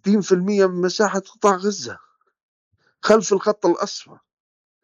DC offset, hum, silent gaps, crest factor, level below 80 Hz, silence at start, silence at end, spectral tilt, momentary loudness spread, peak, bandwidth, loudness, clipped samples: under 0.1%; none; 2.43-2.71 s; 18 dB; -66 dBFS; 0.05 s; 0.8 s; -5 dB/octave; 12 LU; -4 dBFS; 8.2 kHz; -20 LUFS; under 0.1%